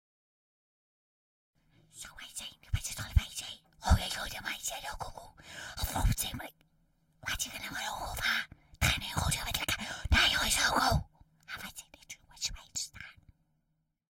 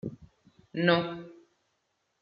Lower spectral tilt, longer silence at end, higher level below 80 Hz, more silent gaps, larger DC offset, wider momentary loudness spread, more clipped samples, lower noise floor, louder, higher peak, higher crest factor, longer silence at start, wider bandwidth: second, -2.5 dB/octave vs -4 dB/octave; about the same, 1 s vs 0.9 s; first, -42 dBFS vs -68 dBFS; neither; neither; about the same, 21 LU vs 19 LU; neither; about the same, -79 dBFS vs -77 dBFS; second, -33 LUFS vs -28 LUFS; about the same, -12 dBFS vs -10 dBFS; about the same, 24 dB vs 24 dB; first, 1.95 s vs 0.05 s; first, 16 kHz vs 5.4 kHz